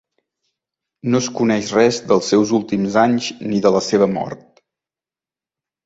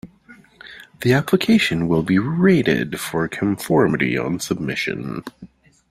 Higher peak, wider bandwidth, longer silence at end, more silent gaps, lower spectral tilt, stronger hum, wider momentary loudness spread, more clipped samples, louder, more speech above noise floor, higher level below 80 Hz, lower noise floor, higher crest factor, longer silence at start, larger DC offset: about the same, -2 dBFS vs -2 dBFS; second, 8 kHz vs 16 kHz; first, 1.5 s vs 0.45 s; neither; about the same, -5 dB/octave vs -6 dB/octave; neither; second, 8 LU vs 15 LU; neither; about the same, -17 LUFS vs -19 LUFS; first, over 73 dB vs 30 dB; second, -56 dBFS vs -50 dBFS; first, under -90 dBFS vs -48 dBFS; about the same, 18 dB vs 18 dB; first, 1.05 s vs 0.05 s; neither